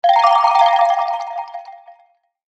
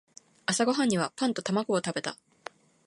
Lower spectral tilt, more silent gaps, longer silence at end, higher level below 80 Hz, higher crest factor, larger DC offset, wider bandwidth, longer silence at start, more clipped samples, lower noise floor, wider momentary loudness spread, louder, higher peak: second, 3 dB/octave vs -4 dB/octave; neither; about the same, 0.65 s vs 0.75 s; second, under -90 dBFS vs -74 dBFS; about the same, 16 dB vs 18 dB; neither; second, 8.4 kHz vs 11.5 kHz; second, 0.05 s vs 0.5 s; neither; first, -57 dBFS vs -49 dBFS; second, 18 LU vs 21 LU; first, -14 LUFS vs -29 LUFS; first, 0 dBFS vs -12 dBFS